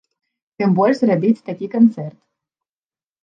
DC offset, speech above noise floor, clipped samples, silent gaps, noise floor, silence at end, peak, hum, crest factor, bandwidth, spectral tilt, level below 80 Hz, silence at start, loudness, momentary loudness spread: under 0.1%; over 74 dB; under 0.1%; none; under -90 dBFS; 1.15 s; -4 dBFS; none; 16 dB; 7.4 kHz; -9 dB/octave; -70 dBFS; 0.6 s; -17 LUFS; 11 LU